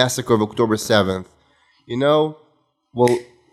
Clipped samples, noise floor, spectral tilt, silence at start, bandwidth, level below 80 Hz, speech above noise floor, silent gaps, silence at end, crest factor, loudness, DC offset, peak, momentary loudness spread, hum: under 0.1%; -62 dBFS; -5 dB/octave; 0 s; 15.5 kHz; -58 dBFS; 44 dB; none; 0.3 s; 20 dB; -19 LUFS; under 0.1%; 0 dBFS; 10 LU; none